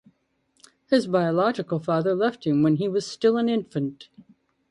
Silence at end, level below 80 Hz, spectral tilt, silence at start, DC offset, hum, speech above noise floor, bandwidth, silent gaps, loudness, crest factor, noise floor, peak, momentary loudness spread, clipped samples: 0.7 s; -68 dBFS; -7 dB/octave; 0.9 s; under 0.1%; none; 47 dB; 11 kHz; none; -24 LUFS; 18 dB; -70 dBFS; -6 dBFS; 7 LU; under 0.1%